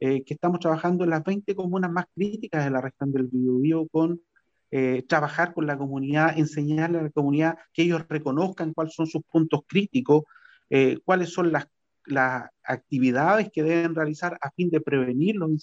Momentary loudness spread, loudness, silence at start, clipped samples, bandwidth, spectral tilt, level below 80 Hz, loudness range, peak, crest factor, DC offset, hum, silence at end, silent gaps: 7 LU; -25 LUFS; 0 s; under 0.1%; 7.8 kHz; -7.5 dB/octave; -70 dBFS; 2 LU; -6 dBFS; 18 dB; under 0.1%; none; 0 s; none